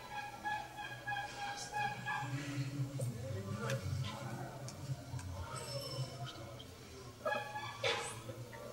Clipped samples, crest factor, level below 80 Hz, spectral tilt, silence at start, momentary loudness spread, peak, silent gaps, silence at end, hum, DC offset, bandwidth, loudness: under 0.1%; 20 dB; -64 dBFS; -4.5 dB/octave; 0 s; 9 LU; -22 dBFS; none; 0 s; none; under 0.1%; 16 kHz; -42 LUFS